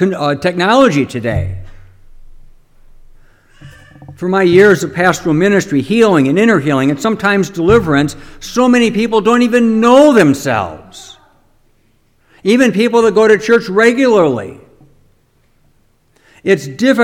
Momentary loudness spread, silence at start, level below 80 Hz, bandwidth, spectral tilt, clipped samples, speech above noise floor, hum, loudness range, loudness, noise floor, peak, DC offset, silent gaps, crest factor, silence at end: 12 LU; 0 s; -40 dBFS; 16 kHz; -5.5 dB/octave; 0.2%; 43 dB; none; 6 LU; -11 LUFS; -54 dBFS; 0 dBFS; under 0.1%; none; 12 dB; 0 s